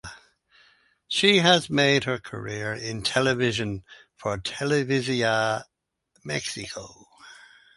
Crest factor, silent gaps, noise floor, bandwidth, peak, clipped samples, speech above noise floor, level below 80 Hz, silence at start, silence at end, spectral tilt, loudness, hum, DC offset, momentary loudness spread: 22 dB; none; -69 dBFS; 11.5 kHz; -4 dBFS; under 0.1%; 45 dB; -56 dBFS; 0.05 s; 0.4 s; -4 dB/octave; -24 LUFS; none; under 0.1%; 15 LU